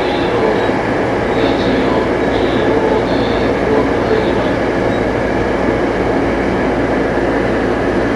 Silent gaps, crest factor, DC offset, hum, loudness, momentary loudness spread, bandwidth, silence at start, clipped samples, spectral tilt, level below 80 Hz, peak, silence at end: none; 14 dB; under 0.1%; none; -14 LUFS; 2 LU; 11.5 kHz; 0 s; under 0.1%; -6.5 dB/octave; -30 dBFS; 0 dBFS; 0 s